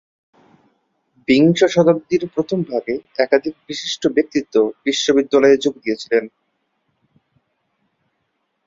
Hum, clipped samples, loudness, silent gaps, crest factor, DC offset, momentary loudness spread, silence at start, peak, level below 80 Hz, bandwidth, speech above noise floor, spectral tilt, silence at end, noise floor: none; under 0.1%; -17 LUFS; none; 18 dB; under 0.1%; 11 LU; 1.3 s; -2 dBFS; -60 dBFS; 7.8 kHz; 54 dB; -5 dB/octave; 2.4 s; -71 dBFS